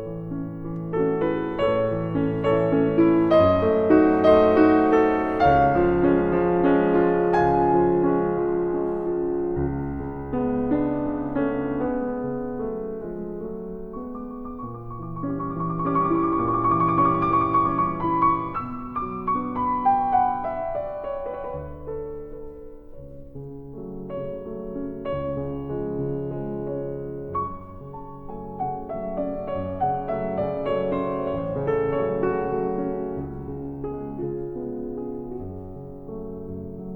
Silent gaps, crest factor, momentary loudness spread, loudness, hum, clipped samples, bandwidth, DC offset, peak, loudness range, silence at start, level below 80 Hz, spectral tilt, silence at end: none; 20 dB; 16 LU; -23 LUFS; none; under 0.1%; 5.8 kHz; under 0.1%; -4 dBFS; 14 LU; 0 s; -44 dBFS; -9.5 dB/octave; 0 s